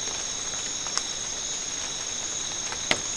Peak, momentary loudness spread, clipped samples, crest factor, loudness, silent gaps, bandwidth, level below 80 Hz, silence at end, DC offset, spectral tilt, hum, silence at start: -4 dBFS; 3 LU; under 0.1%; 28 dB; -28 LUFS; none; 12 kHz; -54 dBFS; 0 s; 0.2%; 0 dB/octave; none; 0 s